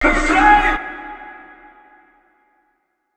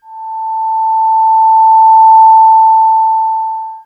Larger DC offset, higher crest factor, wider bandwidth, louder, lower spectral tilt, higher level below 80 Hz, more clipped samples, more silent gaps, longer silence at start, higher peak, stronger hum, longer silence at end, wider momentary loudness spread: neither; first, 20 dB vs 8 dB; first, 9.2 kHz vs 4.7 kHz; second, -14 LUFS vs -7 LUFS; first, -4 dB/octave vs 0.5 dB/octave; first, -30 dBFS vs -82 dBFS; neither; neither; about the same, 0 s vs 0.1 s; about the same, 0 dBFS vs 0 dBFS; neither; first, 1.8 s vs 0.05 s; first, 24 LU vs 14 LU